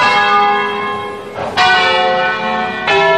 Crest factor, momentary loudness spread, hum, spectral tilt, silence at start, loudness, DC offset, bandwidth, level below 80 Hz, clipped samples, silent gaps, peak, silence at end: 14 dB; 11 LU; none; -3 dB/octave; 0 s; -13 LUFS; 0.4%; 11.5 kHz; -50 dBFS; under 0.1%; none; 0 dBFS; 0 s